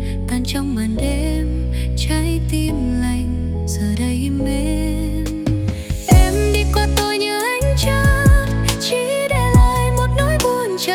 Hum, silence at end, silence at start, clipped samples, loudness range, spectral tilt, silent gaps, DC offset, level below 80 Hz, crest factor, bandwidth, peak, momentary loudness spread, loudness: none; 0 s; 0 s; under 0.1%; 4 LU; -5.5 dB/octave; none; under 0.1%; -20 dBFS; 16 dB; 17.5 kHz; -2 dBFS; 8 LU; -18 LUFS